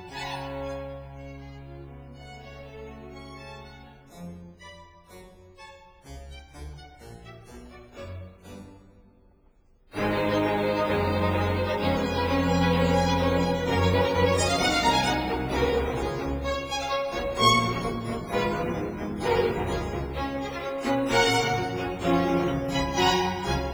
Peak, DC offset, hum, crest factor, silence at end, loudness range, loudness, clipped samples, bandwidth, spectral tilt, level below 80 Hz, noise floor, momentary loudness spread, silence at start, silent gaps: -8 dBFS; under 0.1%; none; 20 dB; 0 s; 22 LU; -25 LUFS; under 0.1%; over 20 kHz; -5 dB/octave; -42 dBFS; -59 dBFS; 22 LU; 0 s; none